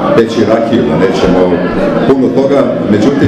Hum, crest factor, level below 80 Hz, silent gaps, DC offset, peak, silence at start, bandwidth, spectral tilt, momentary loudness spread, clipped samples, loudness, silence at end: none; 8 dB; -34 dBFS; none; 0.3%; 0 dBFS; 0 s; 9.8 kHz; -7 dB/octave; 2 LU; 0.4%; -9 LUFS; 0 s